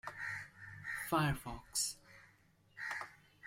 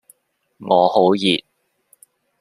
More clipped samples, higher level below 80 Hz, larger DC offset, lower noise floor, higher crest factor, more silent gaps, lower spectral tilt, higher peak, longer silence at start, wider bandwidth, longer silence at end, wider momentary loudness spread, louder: neither; first, -60 dBFS vs -66 dBFS; neither; first, -69 dBFS vs -60 dBFS; about the same, 22 dB vs 18 dB; neither; second, -3.5 dB/octave vs -5.5 dB/octave; second, -20 dBFS vs -2 dBFS; second, 0.05 s vs 0.6 s; about the same, 16 kHz vs 15 kHz; second, 0 s vs 1.05 s; first, 18 LU vs 8 LU; second, -40 LUFS vs -17 LUFS